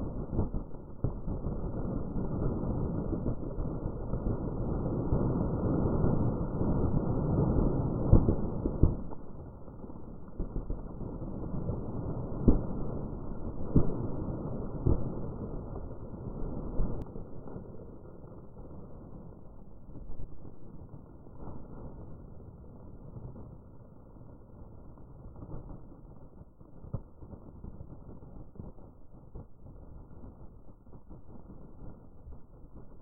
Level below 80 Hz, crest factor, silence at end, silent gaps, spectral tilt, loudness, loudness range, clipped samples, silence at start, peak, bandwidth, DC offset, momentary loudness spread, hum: -38 dBFS; 28 dB; 0 s; none; -14.5 dB/octave; -34 LUFS; 20 LU; under 0.1%; 0 s; -6 dBFS; 1.6 kHz; under 0.1%; 23 LU; none